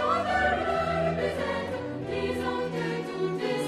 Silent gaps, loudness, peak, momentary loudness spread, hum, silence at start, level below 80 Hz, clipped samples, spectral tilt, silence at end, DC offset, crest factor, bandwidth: none; -29 LUFS; -14 dBFS; 6 LU; none; 0 s; -48 dBFS; under 0.1%; -6 dB/octave; 0 s; under 0.1%; 14 dB; 14 kHz